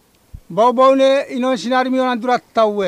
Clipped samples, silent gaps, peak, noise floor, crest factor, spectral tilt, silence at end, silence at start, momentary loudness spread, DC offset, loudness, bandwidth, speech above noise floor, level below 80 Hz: under 0.1%; none; -2 dBFS; -41 dBFS; 14 dB; -5 dB/octave; 0 s; 0.5 s; 7 LU; under 0.1%; -15 LUFS; 10.5 kHz; 26 dB; -50 dBFS